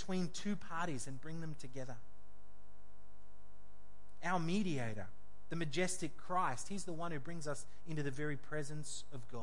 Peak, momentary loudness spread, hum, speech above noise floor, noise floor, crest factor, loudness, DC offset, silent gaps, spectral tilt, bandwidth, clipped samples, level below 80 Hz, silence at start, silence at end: -24 dBFS; 11 LU; none; 23 dB; -65 dBFS; 20 dB; -42 LUFS; 1%; none; -5 dB/octave; 11.5 kHz; under 0.1%; -66 dBFS; 0 s; 0 s